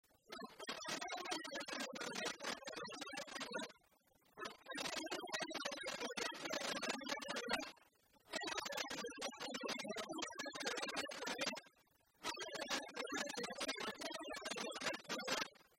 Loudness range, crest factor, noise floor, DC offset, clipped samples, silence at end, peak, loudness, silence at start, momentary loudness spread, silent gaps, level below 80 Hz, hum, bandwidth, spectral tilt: 3 LU; 22 dB; -75 dBFS; under 0.1%; under 0.1%; 0.1 s; -26 dBFS; -45 LUFS; 0.3 s; 6 LU; none; -80 dBFS; none; 16 kHz; -1.5 dB/octave